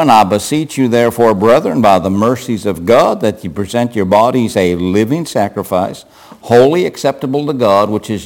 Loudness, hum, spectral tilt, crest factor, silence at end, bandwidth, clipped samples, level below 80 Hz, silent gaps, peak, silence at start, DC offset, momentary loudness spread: -12 LUFS; none; -6 dB/octave; 12 dB; 0 s; 17 kHz; under 0.1%; -48 dBFS; none; 0 dBFS; 0 s; under 0.1%; 8 LU